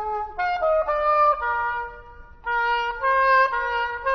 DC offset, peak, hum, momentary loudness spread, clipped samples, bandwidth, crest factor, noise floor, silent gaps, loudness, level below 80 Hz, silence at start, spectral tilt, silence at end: under 0.1%; -8 dBFS; none; 10 LU; under 0.1%; 6.2 kHz; 16 dB; -43 dBFS; none; -22 LUFS; -46 dBFS; 0 s; -3 dB/octave; 0 s